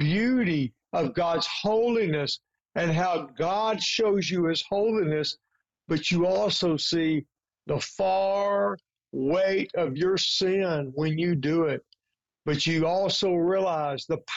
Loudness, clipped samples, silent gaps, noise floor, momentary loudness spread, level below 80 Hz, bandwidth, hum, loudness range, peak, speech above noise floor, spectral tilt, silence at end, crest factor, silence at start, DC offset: -26 LUFS; under 0.1%; none; -86 dBFS; 7 LU; -62 dBFS; 8 kHz; none; 1 LU; -18 dBFS; 61 dB; -5 dB/octave; 0 s; 8 dB; 0 s; under 0.1%